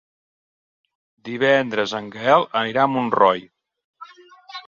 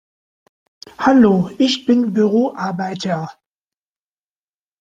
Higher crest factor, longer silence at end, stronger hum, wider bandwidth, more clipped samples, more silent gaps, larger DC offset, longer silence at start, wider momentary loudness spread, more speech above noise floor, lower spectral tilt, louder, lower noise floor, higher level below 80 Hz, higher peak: about the same, 20 dB vs 18 dB; second, 0.05 s vs 1.5 s; neither; about the same, 7.4 kHz vs 7.8 kHz; neither; first, 3.84-3.94 s vs none; neither; first, 1.25 s vs 1 s; about the same, 13 LU vs 11 LU; second, 27 dB vs over 74 dB; about the same, -5.5 dB/octave vs -6 dB/octave; second, -19 LUFS vs -16 LUFS; second, -46 dBFS vs under -90 dBFS; second, -66 dBFS vs -56 dBFS; about the same, -2 dBFS vs 0 dBFS